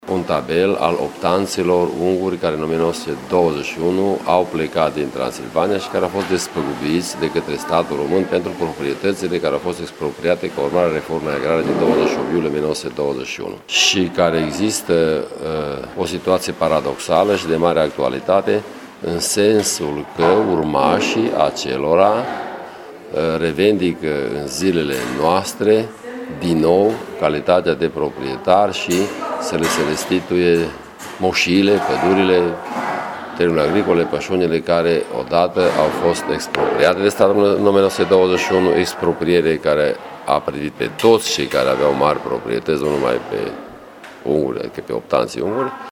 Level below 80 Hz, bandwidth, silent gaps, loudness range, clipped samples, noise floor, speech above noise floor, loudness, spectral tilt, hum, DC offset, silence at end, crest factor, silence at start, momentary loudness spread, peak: -48 dBFS; 18 kHz; none; 4 LU; under 0.1%; -38 dBFS; 21 dB; -18 LUFS; -4.5 dB/octave; none; under 0.1%; 0 s; 18 dB; 0.05 s; 9 LU; 0 dBFS